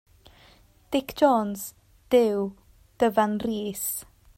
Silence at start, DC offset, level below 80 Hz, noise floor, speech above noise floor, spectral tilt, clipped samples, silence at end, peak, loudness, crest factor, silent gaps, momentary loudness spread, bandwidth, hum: 0.9 s; under 0.1%; -58 dBFS; -56 dBFS; 32 dB; -4.5 dB/octave; under 0.1%; 0.35 s; -6 dBFS; -25 LUFS; 20 dB; none; 13 LU; 16.5 kHz; none